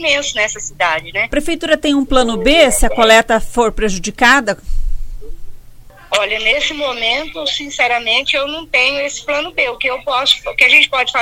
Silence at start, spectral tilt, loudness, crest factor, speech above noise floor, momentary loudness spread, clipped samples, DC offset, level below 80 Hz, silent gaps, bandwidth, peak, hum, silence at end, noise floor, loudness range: 0 s; -2 dB/octave; -13 LUFS; 14 dB; 23 dB; 10 LU; under 0.1%; under 0.1%; -26 dBFS; none; 16.5 kHz; 0 dBFS; none; 0 s; -37 dBFS; 5 LU